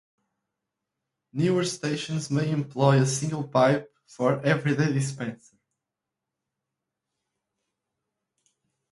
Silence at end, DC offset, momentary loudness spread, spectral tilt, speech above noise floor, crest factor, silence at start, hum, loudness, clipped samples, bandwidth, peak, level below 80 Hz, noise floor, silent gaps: 3.55 s; under 0.1%; 8 LU; -6 dB/octave; 62 dB; 22 dB; 1.35 s; none; -25 LUFS; under 0.1%; 11.5 kHz; -6 dBFS; -68 dBFS; -86 dBFS; none